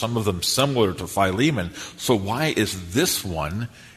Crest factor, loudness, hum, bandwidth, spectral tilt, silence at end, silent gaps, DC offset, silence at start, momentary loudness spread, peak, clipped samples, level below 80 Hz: 20 dB; -23 LUFS; none; 13.5 kHz; -4 dB/octave; 0.05 s; none; under 0.1%; 0 s; 8 LU; -4 dBFS; under 0.1%; -46 dBFS